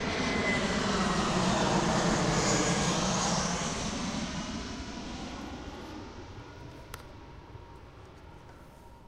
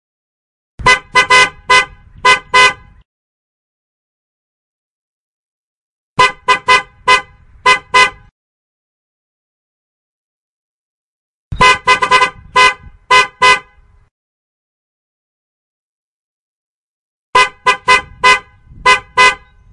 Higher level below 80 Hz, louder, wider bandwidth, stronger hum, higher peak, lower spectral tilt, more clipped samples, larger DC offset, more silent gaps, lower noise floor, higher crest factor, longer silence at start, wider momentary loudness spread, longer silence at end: second, -46 dBFS vs -40 dBFS; second, -30 LUFS vs -10 LUFS; first, 13.5 kHz vs 11.5 kHz; neither; second, -16 dBFS vs 0 dBFS; first, -4 dB/octave vs -1 dB/octave; neither; neither; second, none vs 3.05-6.16 s, 8.31-11.51 s, 14.11-17.33 s; first, -51 dBFS vs -46 dBFS; about the same, 16 dB vs 14 dB; second, 0 s vs 0.8 s; first, 22 LU vs 6 LU; second, 0 s vs 0.35 s